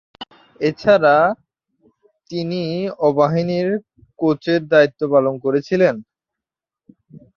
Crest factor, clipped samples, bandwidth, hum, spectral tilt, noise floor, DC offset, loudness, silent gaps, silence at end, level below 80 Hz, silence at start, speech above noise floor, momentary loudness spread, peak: 18 dB; under 0.1%; 7 kHz; none; -7.5 dB/octave; -87 dBFS; under 0.1%; -18 LUFS; none; 0.2 s; -60 dBFS; 0.2 s; 70 dB; 15 LU; -2 dBFS